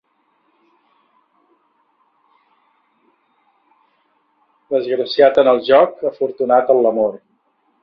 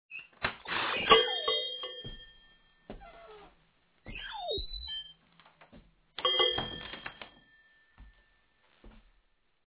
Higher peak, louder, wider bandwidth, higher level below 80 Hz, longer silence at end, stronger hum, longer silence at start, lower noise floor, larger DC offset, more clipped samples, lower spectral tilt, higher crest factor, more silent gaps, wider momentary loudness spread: first, 0 dBFS vs -8 dBFS; first, -15 LUFS vs -30 LUFS; first, 5.6 kHz vs 4 kHz; second, -64 dBFS vs -56 dBFS; about the same, 0.65 s vs 0.75 s; neither; first, 4.7 s vs 0.1 s; second, -63 dBFS vs -72 dBFS; neither; neither; first, -7 dB/octave vs 0.5 dB/octave; second, 18 dB vs 28 dB; neither; second, 10 LU vs 27 LU